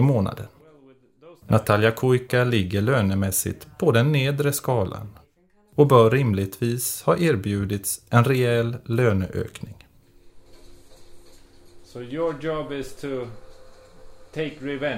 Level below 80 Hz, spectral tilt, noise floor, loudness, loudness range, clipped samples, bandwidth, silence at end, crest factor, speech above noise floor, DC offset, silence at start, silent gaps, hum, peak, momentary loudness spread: -52 dBFS; -6 dB/octave; -59 dBFS; -22 LUFS; 12 LU; under 0.1%; 16 kHz; 0 s; 20 dB; 38 dB; under 0.1%; 0 s; none; none; -4 dBFS; 15 LU